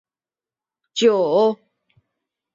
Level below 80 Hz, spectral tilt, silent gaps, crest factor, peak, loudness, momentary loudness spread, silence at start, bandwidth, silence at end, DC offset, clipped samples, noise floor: -72 dBFS; -4.5 dB/octave; none; 18 dB; -4 dBFS; -18 LUFS; 14 LU; 0.95 s; 7.6 kHz; 1 s; under 0.1%; under 0.1%; under -90 dBFS